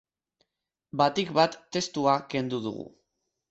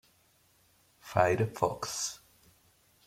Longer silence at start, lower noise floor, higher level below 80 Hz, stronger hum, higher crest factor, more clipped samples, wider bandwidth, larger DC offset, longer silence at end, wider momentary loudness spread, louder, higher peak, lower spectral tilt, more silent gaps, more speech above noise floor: about the same, 0.95 s vs 1.05 s; first, -84 dBFS vs -67 dBFS; about the same, -68 dBFS vs -66 dBFS; neither; about the same, 22 dB vs 26 dB; neither; second, 8.2 kHz vs 16.5 kHz; neither; second, 0.65 s vs 0.9 s; second, 13 LU vs 17 LU; first, -27 LUFS vs -31 LUFS; about the same, -8 dBFS vs -10 dBFS; about the same, -4.5 dB/octave vs -4 dB/octave; neither; first, 57 dB vs 38 dB